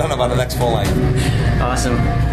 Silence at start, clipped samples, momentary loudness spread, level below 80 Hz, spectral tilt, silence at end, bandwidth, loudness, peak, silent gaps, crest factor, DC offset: 0 s; under 0.1%; 1 LU; -22 dBFS; -6 dB/octave; 0 s; 14 kHz; -17 LUFS; -4 dBFS; none; 12 dB; under 0.1%